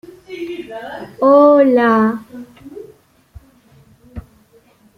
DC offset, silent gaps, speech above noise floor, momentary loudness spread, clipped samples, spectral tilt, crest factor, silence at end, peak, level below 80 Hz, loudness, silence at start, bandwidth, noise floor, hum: under 0.1%; none; 38 dB; 27 LU; under 0.1%; -7.5 dB/octave; 16 dB; 0.75 s; -2 dBFS; -48 dBFS; -12 LUFS; 0.3 s; 6.4 kHz; -51 dBFS; none